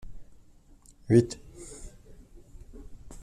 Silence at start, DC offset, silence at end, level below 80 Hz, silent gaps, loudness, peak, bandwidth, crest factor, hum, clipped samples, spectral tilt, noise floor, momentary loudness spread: 0.05 s; under 0.1%; 0 s; -50 dBFS; none; -25 LUFS; -8 dBFS; 11.5 kHz; 24 dB; none; under 0.1%; -7.5 dB/octave; -55 dBFS; 28 LU